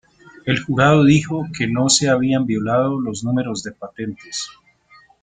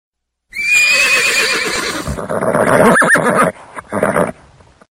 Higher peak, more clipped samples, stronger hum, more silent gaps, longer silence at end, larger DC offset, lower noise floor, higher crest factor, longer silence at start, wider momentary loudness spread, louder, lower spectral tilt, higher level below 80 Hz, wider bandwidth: about the same, -2 dBFS vs 0 dBFS; neither; neither; neither; about the same, 0.7 s vs 0.6 s; neither; first, -51 dBFS vs -45 dBFS; about the same, 18 dB vs 14 dB; about the same, 0.45 s vs 0.55 s; first, 16 LU vs 12 LU; second, -18 LUFS vs -12 LUFS; first, -4.5 dB/octave vs -3 dB/octave; second, -52 dBFS vs -40 dBFS; second, 9.6 kHz vs 16.5 kHz